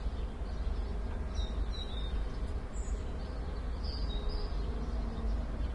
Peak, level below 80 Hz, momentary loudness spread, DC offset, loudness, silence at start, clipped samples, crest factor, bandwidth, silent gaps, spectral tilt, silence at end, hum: -24 dBFS; -36 dBFS; 3 LU; under 0.1%; -39 LUFS; 0 s; under 0.1%; 12 dB; 9.6 kHz; none; -6.5 dB/octave; 0 s; none